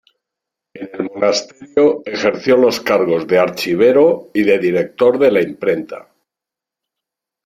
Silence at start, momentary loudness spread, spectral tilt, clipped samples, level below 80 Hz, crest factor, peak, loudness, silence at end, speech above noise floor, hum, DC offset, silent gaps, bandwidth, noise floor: 0.75 s; 12 LU; -5 dB/octave; under 0.1%; -60 dBFS; 14 dB; -2 dBFS; -15 LUFS; 1.45 s; 71 dB; none; under 0.1%; none; 15 kHz; -85 dBFS